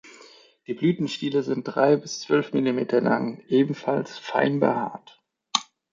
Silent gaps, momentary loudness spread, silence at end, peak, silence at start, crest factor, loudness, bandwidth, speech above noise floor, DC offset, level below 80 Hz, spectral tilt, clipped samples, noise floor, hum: none; 6 LU; 0.3 s; -4 dBFS; 0.05 s; 22 dB; -24 LUFS; 7.6 kHz; 28 dB; under 0.1%; -72 dBFS; -5.5 dB/octave; under 0.1%; -52 dBFS; none